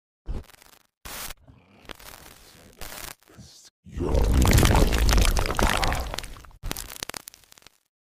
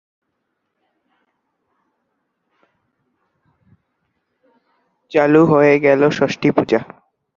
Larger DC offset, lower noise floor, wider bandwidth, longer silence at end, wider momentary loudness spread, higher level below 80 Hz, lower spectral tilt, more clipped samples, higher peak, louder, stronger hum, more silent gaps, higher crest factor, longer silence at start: neither; second, -55 dBFS vs -73 dBFS; first, 16 kHz vs 7.4 kHz; first, 1.1 s vs 0.55 s; first, 25 LU vs 9 LU; first, -28 dBFS vs -60 dBFS; second, -4.5 dB/octave vs -7 dB/octave; neither; about the same, -2 dBFS vs 0 dBFS; second, -25 LUFS vs -14 LUFS; neither; first, 0.97-1.01 s, 3.70-3.83 s vs none; about the same, 22 dB vs 18 dB; second, 0.3 s vs 5.1 s